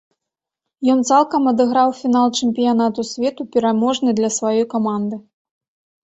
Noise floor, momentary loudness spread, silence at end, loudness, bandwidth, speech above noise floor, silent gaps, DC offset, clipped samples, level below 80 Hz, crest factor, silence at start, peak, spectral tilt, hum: -84 dBFS; 7 LU; 0.85 s; -17 LUFS; 8.2 kHz; 67 dB; none; under 0.1%; under 0.1%; -62 dBFS; 16 dB; 0.8 s; -2 dBFS; -4.5 dB/octave; none